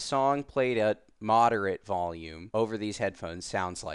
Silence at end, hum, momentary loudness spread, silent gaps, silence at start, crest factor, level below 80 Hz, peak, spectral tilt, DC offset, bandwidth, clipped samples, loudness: 0 s; none; 11 LU; none; 0 s; 18 dB; -58 dBFS; -12 dBFS; -5 dB/octave; under 0.1%; 11.5 kHz; under 0.1%; -29 LUFS